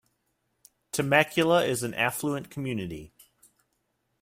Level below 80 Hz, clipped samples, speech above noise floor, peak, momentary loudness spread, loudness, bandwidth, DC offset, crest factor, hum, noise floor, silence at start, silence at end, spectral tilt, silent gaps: -62 dBFS; under 0.1%; 50 dB; -6 dBFS; 12 LU; -26 LUFS; 16 kHz; under 0.1%; 22 dB; none; -76 dBFS; 0.95 s; 1.15 s; -4.5 dB/octave; none